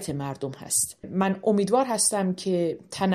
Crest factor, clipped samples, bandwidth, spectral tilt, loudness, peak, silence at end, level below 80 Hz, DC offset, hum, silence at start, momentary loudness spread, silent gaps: 16 dB; under 0.1%; 14 kHz; -4 dB/octave; -25 LUFS; -8 dBFS; 0 s; -62 dBFS; under 0.1%; none; 0 s; 9 LU; none